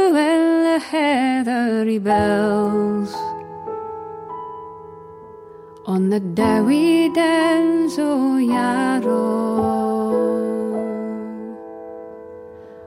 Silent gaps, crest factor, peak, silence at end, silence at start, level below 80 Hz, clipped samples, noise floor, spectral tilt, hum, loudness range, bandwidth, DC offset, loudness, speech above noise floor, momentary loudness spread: none; 14 dB; -6 dBFS; 0 s; 0 s; -56 dBFS; under 0.1%; -40 dBFS; -6 dB/octave; none; 8 LU; 15.5 kHz; under 0.1%; -19 LUFS; 22 dB; 20 LU